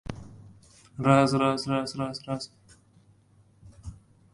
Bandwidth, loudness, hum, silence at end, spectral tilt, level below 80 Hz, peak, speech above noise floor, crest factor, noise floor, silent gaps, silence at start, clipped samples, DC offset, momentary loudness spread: 11.5 kHz; -26 LUFS; none; 0.4 s; -6 dB/octave; -54 dBFS; -6 dBFS; 35 dB; 22 dB; -60 dBFS; none; 0.1 s; under 0.1%; under 0.1%; 25 LU